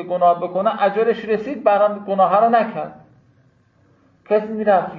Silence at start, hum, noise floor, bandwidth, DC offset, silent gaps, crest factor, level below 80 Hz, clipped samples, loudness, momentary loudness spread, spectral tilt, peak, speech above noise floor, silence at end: 0 s; none; -57 dBFS; 5.2 kHz; under 0.1%; none; 16 dB; -64 dBFS; under 0.1%; -18 LUFS; 7 LU; -8.5 dB/octave; -2 dBFS; 39 dB; 0 s